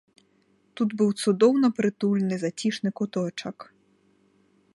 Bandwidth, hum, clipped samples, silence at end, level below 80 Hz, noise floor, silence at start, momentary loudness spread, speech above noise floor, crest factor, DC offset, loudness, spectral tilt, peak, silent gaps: 11.5 kHz; none; under 0.1%; 1.1 s; -72 dBFS; -65 dBFS; 0.75 s; 12 LU; 41 dB; 18 dB; under 0.1%; -25 LUFS; -6 dB/octave; -8 dBFS; none